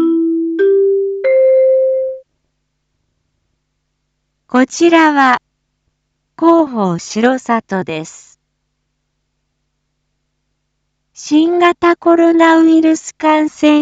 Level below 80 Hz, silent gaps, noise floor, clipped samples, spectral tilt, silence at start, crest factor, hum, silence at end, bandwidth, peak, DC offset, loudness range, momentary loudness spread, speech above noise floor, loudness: -60 dBFS; none; -69 dBFS; under 0.1%; -5 dB/octave; 0 s; 14 dB; none; 0 s; 8 kHz; 0 dBFS; under 0.1%; 9 LU; 10 LU; 58 dB; -12 LUFS